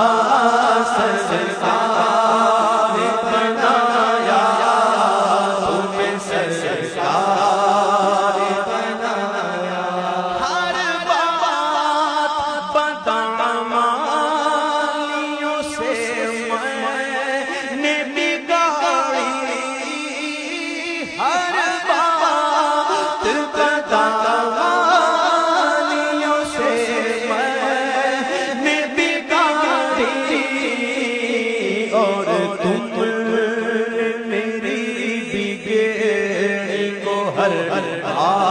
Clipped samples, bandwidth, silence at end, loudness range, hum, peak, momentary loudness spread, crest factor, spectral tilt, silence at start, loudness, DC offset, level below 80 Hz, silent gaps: under 0.1%; 10.5 kHz; 0 s; 4 LU; none; -4 dBFS; 7 LU; 14 dB; -3.5 dB/octave; 0 s; -18 LUFS; under 0.1%; -58 dBFS; none